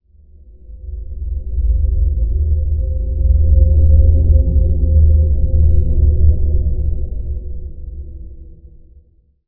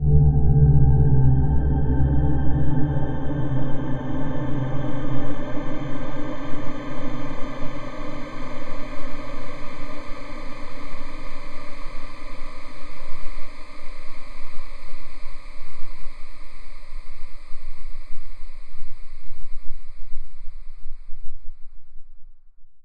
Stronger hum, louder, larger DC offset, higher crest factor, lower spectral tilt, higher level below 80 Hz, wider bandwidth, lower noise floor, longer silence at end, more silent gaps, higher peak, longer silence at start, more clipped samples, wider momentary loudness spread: neither; first, -16 LUFS vs -25 LUFS; neither; about the same, 14 dB vs 12 dB; first, -17 dB/octave vs -9 dB/octave; first, -14 dBFS vs -28 dBFS; second, 0.8 kHz vs 4.9 kHz; first, -50 dBFS vs -37 dBFS; first, 0.95 s vs 0.05 s; neither; first, 0 dBFS vs -4 dBFS; first, 0.7 s vs 0 s; neither; second, 19 LU vs 26 LU